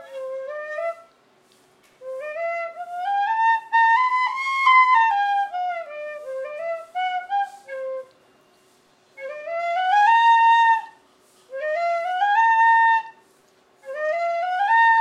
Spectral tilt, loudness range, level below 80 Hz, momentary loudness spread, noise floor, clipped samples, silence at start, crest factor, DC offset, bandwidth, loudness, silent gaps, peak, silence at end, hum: 0.5 dB/octave; 11 LU; -88 dBFS; 18 LU; -58 dBFS; under 0.1%; 0 s; 16 dB; under 0.1%; 9.6 kHz; -20 LUFS; none; -6 dBFS; 0 s; none